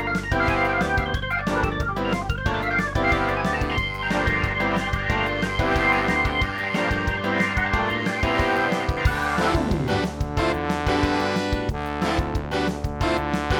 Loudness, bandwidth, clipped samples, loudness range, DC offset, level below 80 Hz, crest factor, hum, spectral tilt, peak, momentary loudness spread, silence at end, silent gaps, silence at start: -23 LUFS; 18.5 kHz; under 0.1%; 2 LU; under 0.1%; -32 dBFS; 16 dB; none; -5.5 dB/octave; -6 dBFS; 4 LU; 0 s; none; 0 s